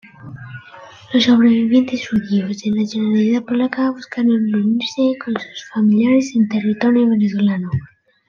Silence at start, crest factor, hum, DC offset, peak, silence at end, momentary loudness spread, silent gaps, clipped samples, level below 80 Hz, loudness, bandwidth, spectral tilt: 0.2 s; 14 dB; none; under 0.1%; -2 dBFS; 0.4 s; 13 LU; none; under 0.1%; -58 dBFS; -17 LUFS; 7.2 kHz; -6.5 dB/octave